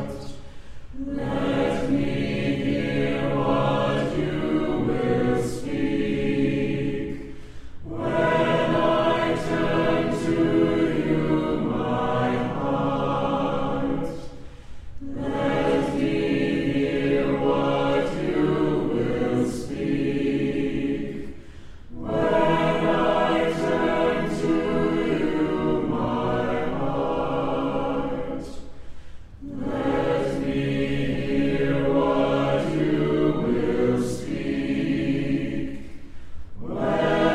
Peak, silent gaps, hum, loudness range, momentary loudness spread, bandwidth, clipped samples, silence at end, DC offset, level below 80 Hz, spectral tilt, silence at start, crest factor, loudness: -8 dBFS; none; none; 4 LU; 12 LU; 12 kHz; under 0.1%; 0 s; under 0.1%; -42 dBFS; -7 dB/octave; 0 s; 16 dB; -24 LUFS